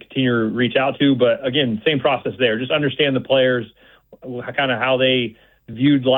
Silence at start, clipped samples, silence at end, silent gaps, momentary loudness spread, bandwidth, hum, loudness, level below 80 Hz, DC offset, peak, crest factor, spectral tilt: 0.1 s; under 0.1%; 0 s; none; 9 LU; 4.1 kHz; none; -18 LUFS; -58 dBFS; under 0.1%; -4 dBFS; 14 dB; -9.5 dB/octave